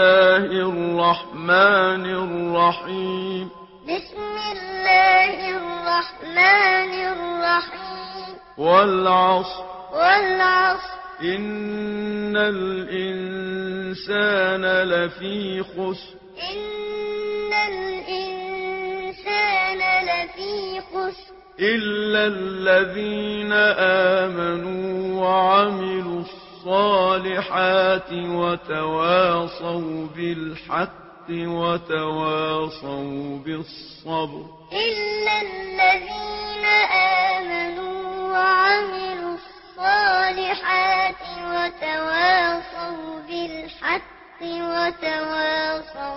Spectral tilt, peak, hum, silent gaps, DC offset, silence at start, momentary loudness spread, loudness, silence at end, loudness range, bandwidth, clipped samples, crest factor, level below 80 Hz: -8 dB/octave; -2 dBFS; none; none; under 0.1%; 0 s; 14 LU; -21 LUFS; 0 s; 7 LU; 5.8 kHz; under 0.1%; 20 dB; -54 dBFS